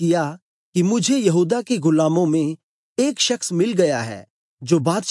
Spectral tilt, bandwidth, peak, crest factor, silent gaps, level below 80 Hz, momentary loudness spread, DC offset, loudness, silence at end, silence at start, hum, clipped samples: -5 dB/octave; 11.5 kHz; -4 dBFS; 16 dB; 0.42-0.73 s, 2.63-2.96 s, 4.30-4.57 s; -72 dBFS; 12 LU; under 0.1%; -19 LUFS; 0 s; 0 s; none; under 0.1%